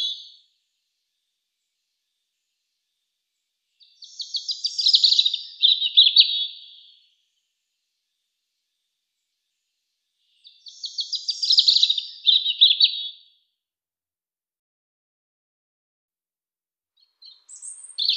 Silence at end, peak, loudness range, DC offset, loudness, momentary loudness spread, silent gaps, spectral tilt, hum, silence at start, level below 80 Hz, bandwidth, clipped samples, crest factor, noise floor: 0 s; 0 dBFS; 16 LU; under 0.1%; -17 LUFS; 20 LU; 14.59-16.08 s; 11 dB/octave; none; 0 s; under -90 dBFS; 13 kHz; under 0.1%; 24 dB; under -90 dBFS